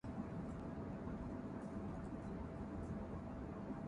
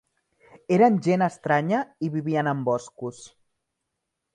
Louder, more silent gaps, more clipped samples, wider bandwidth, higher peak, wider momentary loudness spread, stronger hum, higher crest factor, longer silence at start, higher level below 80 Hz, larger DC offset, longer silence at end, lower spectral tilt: second, -48 LUFS vs -23 LUFS; neither; neither; about the same, 10.5 kHz vs 10.5 kHz; second, -34 dBFS vs -8 dBFS; second, 1 LU vs 13 LU; neither; about the same, 14 dB vs 18 dB; second, 0.05 s vs 0.7 s; first, -56 dBFS vs -70 dBFS; neither; second, 0 s vs 1.05 s; first, -9 dB/octave vs -7 dB/octave